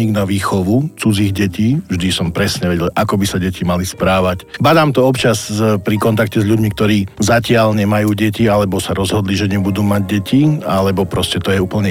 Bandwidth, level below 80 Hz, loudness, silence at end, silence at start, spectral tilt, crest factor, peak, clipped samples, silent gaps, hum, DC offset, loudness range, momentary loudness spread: 17 kHz; -38 dBFS; -15 LUFS; 0 s; 0 s; -6 dB/octave; 12 dB; -2 dBFS; under 0.1%; none; none; under 0.1%; 2 LU; 4 LU